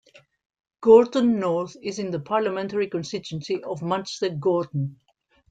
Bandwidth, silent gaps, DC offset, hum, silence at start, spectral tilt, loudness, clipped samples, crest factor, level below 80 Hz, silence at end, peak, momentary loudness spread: 8.8 kHz; none; under 0.1%; none; 0.8 s; -6.5 dB/octave; -23 LUFS; under 0.1%; 20 dB; -66 dBFS; 0.6 s; -4 dBFS; 15 LU